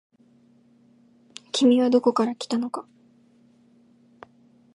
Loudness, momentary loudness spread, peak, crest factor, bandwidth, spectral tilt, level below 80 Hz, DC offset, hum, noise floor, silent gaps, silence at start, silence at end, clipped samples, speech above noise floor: -22 LUFS; 21 LU; -8 dBFS; 20 dB; 11 kHz; -4.5 dB/octave; -80 dBFS; under 0.1%; none; -58 dBFS; none; 1.55 s; 1.9 s; under 0.1%; 37 dB